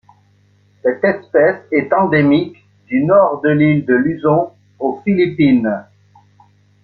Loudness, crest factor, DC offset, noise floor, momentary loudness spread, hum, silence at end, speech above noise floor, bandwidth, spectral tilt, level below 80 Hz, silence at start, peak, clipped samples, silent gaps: -15 LUFS; 14 dB; under 0.1%; -53 dBFS; 9 LU; 50 Hz at -35 dBFS; 1 s; 40 dB; 4.6 kHz; -10 dB/octave; -54 dBFS; 0.85 s; -2 dBFS; under 0.1%; none